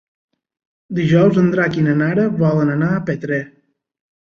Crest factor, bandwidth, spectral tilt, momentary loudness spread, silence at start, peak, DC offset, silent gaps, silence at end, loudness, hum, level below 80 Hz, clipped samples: 16 dB; 6.8 kHz; -9 dB/octave; 10 LU; 0.9 s; -2 dBFS; under 0.1%; none; 0.85 s; -16 LUFS; none; -54 dBFS; under 0.1%